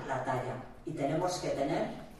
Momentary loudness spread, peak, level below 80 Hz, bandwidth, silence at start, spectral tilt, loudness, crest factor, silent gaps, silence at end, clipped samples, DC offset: 9 LU; -20 dBFS; -58 dBFS; 14 kHz; 0 s; -5.5 dB/octave; -35 LUFS; 14 dB; none; 0 s; under 0.1%; under 0.1%